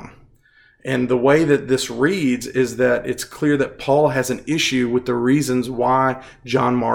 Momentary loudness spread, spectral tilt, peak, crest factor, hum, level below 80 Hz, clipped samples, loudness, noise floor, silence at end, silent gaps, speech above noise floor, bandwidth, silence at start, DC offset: 6 LU; -5 dB/octave; -2 dBFS; 16 dB; none; -52 dBFS; under 0.1%; -19 LUFS; -54 dBFS; 0 s; none; 36 dB; 17.5 kHz; 0 s; under 0.1%